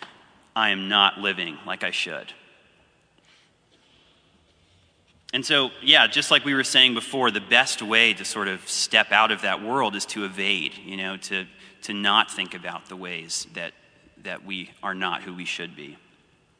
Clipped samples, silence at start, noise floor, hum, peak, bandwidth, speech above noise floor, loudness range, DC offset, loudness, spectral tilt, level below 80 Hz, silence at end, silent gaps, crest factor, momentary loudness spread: under 0.1%; 0 s; -61 dBFS; none; -2 dBFS; 11 kHz; 37 dB; 13 LU; under 0.1%; -21 LUFS; -1.5 dB/octave; -72 dBFS; 0.65 s; none; 24 dB; 18 LU